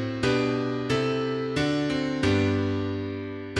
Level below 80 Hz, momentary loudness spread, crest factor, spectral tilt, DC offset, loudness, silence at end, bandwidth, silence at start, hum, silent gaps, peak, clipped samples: -50 dBFS; 7 LU; 14 dB; -6 dB/octave; under 0.1%; -26 LUFS; 0 s; 11.5 kHz; 0 s; none; none; -12 dBFS; under 0.1%